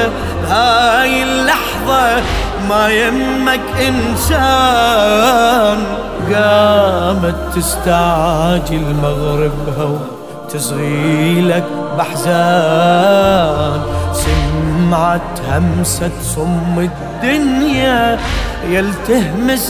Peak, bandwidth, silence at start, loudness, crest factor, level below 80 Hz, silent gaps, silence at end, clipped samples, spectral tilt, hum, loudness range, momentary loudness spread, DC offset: 0 dBFS; 16 kHz; 0 s; -13 LUFS; 12 dB; -26 dBFS; none; 0 s; under 0.1%; -5 dB/octave; none; 4 LU; 8 LU; 0.5%